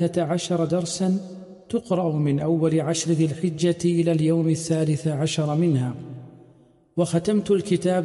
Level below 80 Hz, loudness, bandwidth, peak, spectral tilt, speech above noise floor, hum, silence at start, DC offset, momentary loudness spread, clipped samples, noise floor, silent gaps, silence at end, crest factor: -60 dBFS; -23 LUFS; 11.5 kHz; -10 dBFS; -6.5 dB/octave; 33 dB; none; 0 s; under 0.1%; 9 LU; under 0.1%; -55 dBFS; none; 0 s; 14 dB